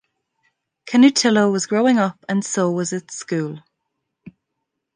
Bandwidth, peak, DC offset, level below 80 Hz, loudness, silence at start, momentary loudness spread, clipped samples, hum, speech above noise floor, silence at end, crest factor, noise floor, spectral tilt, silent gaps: 10 kHz; -2 dBFS; under 0.1%; -70 dBFS; -18 LUFS; 0.85 s; 12 LU; under 0.1%; none; 60 dB; 1.35 s; 18 dB; -78 dBFS; -4.5 dB/octave; none